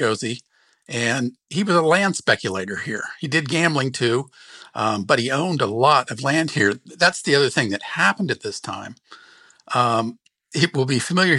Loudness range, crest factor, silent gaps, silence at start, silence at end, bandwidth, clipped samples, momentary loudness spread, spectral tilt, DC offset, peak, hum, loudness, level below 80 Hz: 4 LU; 18 dB; none; 0 s; 0 s; 12.5 kHz; under 0.1%; 12 LU; -4.5 dB/octave; under 0.1%; -2 dBFS; none; -20 LUFS; -68 dBFS